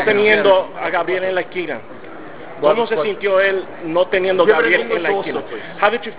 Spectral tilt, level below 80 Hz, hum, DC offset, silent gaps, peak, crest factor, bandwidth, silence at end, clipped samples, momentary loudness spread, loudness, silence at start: -8 dB/octave; -56 dBFS; none; 2%; none; 0 dBFS; 18 dB; 4 kHz; 0 s; under 0.1%; 17 LU; -17 LUFS; 0 s